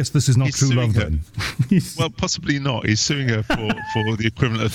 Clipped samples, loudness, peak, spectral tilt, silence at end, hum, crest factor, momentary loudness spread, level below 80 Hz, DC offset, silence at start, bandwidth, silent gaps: under 0.1%; -20 LUFS; -2 dBFS; -5 dB/octave; 0 s; none; 18 dB; 6 LU; -36 dBFS; under 0.1%; 0 s; 15 kHz; none